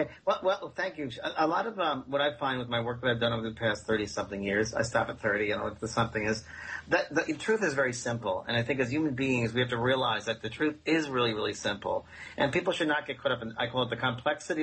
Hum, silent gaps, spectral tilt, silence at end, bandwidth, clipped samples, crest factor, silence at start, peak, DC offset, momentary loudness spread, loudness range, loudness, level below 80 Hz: none; none; -4.5 dB/octave; 0 s; 8.4 kHz; under 0.1%; 18 dB; 0 s; -12 dBFS; under 0.1%; 6 LU; 2 LU; -30 LUFS; -58 dBFS